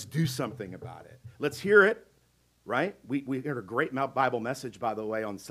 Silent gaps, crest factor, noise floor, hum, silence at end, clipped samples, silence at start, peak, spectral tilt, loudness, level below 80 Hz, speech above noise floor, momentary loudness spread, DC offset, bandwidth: none; 22 dB; -67 dBFS; none; 0 s; under 0.1%; 0 s; -8 dBFS; -5.5 dB/octave; -29 LUFS; -68 dBFS; 38 dB; 18 LU; under 0.1%; 15.5 kHz